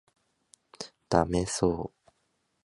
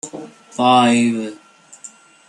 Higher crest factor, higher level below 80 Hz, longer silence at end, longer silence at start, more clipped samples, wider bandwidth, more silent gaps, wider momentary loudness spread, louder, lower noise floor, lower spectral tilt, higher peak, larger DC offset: first, 26 dB vs 16 dB; first, -48 dBFS vs -68 dBFS; first, 0.8 s vs 0.4 s; first, 0.8 s vs 0.05 s; neither; about the same, 11.5 kHz vs 11 kHz; neither; second, 17 LU vs 25 LU; second, -28 LUFS vs -15 LUFS; first, -75 dBFS vs -43 dBFS; about the same, -5 dB/octave vs -4 dB/octave; second, -6 dBFS vs -2 dBFS; neither